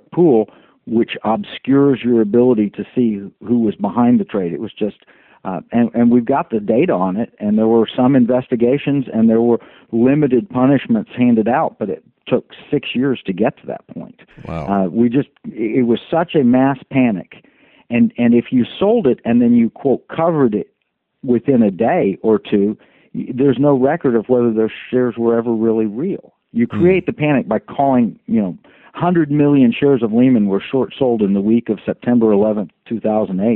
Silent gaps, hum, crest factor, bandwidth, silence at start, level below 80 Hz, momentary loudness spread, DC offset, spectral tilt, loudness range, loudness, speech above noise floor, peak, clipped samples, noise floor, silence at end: none; none; 14 dB; 4 kHz; 0.15 s; -54 dBFS; 11 LU; under 0.1%; -7 dB/octave; 4 LU; -16 LUFS; 55 dB; -2 dBFS; under 0.1%; -70 dBFS; 0 s